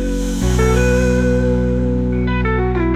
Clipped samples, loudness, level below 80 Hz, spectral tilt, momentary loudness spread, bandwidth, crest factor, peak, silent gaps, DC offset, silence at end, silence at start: under 0.1%; -16 LUFS; -20 dBFS; -6.5 dB/octave; 4 LU; 14 kHz; 12 dB; -2 dBFS; none; under 0.1%; 0 s; 0 s